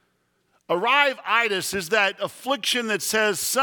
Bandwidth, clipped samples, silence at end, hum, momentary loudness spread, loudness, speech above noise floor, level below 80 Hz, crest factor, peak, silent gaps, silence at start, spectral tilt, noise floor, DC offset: 19.5 kHz; under 0.1%; 0 s; none; 7 LU; -22 LUFS; 46 dB; -66 dBFS; 20 dB; -4 dBFS; none; 0.7 s; -1.5 dB/octave; -69 dBFS; under 0.1%